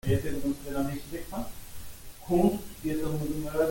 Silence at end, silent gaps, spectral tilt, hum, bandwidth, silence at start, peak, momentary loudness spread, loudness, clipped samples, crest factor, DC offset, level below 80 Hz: 0 s; none; -6.5 dB/octave; none; 17 kHz; 0.05 s; -12 dBFS; 20 LU; -31 LUFS; under 0.1%; 18 dB; under 0.1%; -44 dBFS